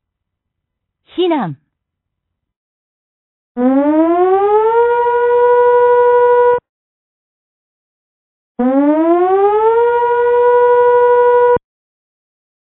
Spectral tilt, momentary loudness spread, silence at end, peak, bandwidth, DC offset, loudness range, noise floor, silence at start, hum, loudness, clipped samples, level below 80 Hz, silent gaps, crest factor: -10.5 dB/octave; 8 LU; 1.1 s; -2 dBFS; 4 kHz; under 0.1%; 8 LU; -76 dBFS; 1.15 s; none; -11 LUFS; under 0.1%; -54 dBFS; 2.56-3.55 s, 6.69-8.55 s; 12 dB